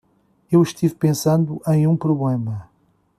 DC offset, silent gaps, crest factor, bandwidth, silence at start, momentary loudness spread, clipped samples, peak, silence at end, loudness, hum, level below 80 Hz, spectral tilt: under 0.1%; none; 16 dB; 14.5 kHz; 0.5 s; 7 LU; under 0.1%; -4 dBFS; 0.55 s; -19 LUFS; none; -58 dBFS; -7.5 dB/octave